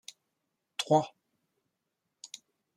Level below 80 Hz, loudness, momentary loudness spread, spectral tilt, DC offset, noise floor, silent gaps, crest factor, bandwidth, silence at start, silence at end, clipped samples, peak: -76 dBFS; -30 LUFS; 23 LU; -5 dB/octave; under 0.1%; -84 dBFS; none; 24 dB; 15.5 kHz; 0.8 s; 0.5 s; under 0.1%; -12 dBFS